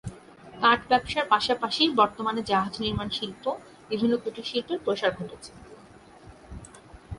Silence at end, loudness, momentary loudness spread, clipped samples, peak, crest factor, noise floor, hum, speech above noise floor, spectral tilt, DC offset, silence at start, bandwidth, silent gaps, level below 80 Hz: 0 s; -26 LUFS; 21 LU; under 0.1%; -4 dBFS; 22 dB; -51 dBFS; none; 25 dB; -4.5 dB/octave; under 0.1%; 0.05 s; 11.5 kHz; none; -52 dBFS